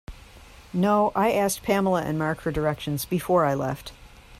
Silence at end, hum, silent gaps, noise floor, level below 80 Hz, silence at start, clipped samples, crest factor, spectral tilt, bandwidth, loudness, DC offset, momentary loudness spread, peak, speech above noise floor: 0.05 s; none; none; -48 dBFS; -48 dBFS; 0.1 s; under 0.1%; 16 dB; -5.5 dB/octave; 15.5 kHz; -24 LUFS; under 0.1%; 9 LU; -8 dBFS; 24 dB